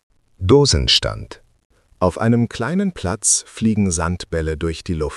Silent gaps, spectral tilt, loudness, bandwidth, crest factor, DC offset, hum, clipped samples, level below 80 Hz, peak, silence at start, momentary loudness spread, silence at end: 1.65-1.70 s; -4 dB/octave; -18 LUFS; 13 kHz; 18 dB; under 0.1%; none; under 0.1%; -34 dBFS; 0 dBFS; 0.4 s; 11 LU; 0 s